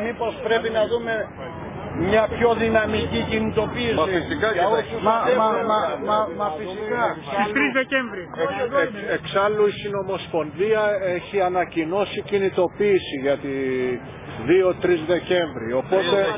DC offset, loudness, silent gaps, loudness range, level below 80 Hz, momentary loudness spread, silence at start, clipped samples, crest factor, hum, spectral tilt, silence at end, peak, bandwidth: under 0.1%; -22 LUFS; none; 2 LU; -46 dBFS; 8 LU; 0 s; under 0.1%; 18 dB; none; -9.5 dB/octave; 0 s; -4 dBFS; 3.9 kHz